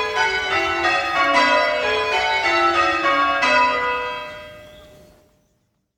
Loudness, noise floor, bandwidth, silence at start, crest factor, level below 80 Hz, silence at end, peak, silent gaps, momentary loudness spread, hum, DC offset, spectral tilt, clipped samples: -18 LUFS; -67 dBFS; 16.5 kHz; 0 s; 16 dB; -50 dBFS; 1.15 s; -4 dBFS; none; 8 LU; none; under 0.1%; -2.5 dB/octave; under 0.1%